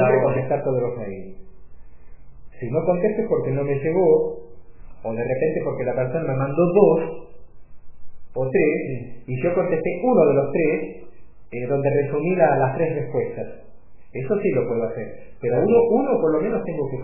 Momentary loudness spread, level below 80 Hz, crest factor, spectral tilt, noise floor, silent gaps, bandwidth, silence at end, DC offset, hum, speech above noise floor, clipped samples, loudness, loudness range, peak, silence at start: 16 LU; -50 dBFS; 20 dB; -13 dB/octave; -47 dBFS; none; 2.9 kHz; 0 s; 1%; none; 26 dB; under 0.1%; -21 LUFS; 4 LU; -2 dBFS; 0 s